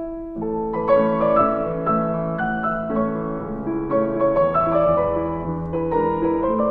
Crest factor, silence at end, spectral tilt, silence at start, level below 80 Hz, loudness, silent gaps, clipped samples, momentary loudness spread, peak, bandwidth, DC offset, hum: 16 dB; 0 s; -10.5 dB/octave; 0 s; -42 dBFS; -21 LUFS; none; under 0.1%; 9 LU; -4 dBFS; 4.8 kHz; under 0.1%; none